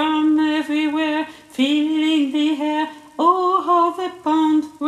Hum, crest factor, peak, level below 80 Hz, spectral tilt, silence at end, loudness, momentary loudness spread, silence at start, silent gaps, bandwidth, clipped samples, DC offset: none; 16 dB; -2 dBFS; -64 dBFS; -3.5 dB/octave; 0 s; -19 LUFS; 7 LU; 0 s; none; 11 kHz; under 0.1%; under 0.1%